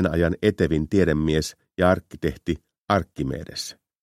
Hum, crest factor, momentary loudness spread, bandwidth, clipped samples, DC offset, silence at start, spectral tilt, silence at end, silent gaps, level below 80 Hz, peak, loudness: none; 20 dB; 11 LU; 15 kHz; under 0.1%; under 0.1%; 0 s; -6 dB/octave; 0.3 s; 2.78-2.86 s; -40 dBFS; -4 dBFS; -24 LUFS